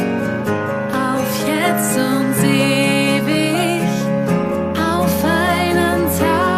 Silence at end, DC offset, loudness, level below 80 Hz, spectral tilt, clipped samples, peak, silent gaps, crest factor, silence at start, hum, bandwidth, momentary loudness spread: 0 s; under 0.1%; -16 LUFS; -44 dBFS; -5 dB/octave; under 0.1%; -2 dBFS; none; 14 dB; 0 s; none; 15 kHz; 5 LU